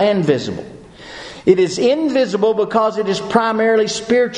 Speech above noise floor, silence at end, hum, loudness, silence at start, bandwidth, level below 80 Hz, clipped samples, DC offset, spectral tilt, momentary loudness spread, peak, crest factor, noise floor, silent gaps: 20 dB; 0 s; none; -16 LUFS; 0 s; 10.5 kHz; -54 dBFS; under 0.1%; under 0.1%; -5 dB/octave; 16 LU; 0 dBFS; 16 dB; -35 dBFS; none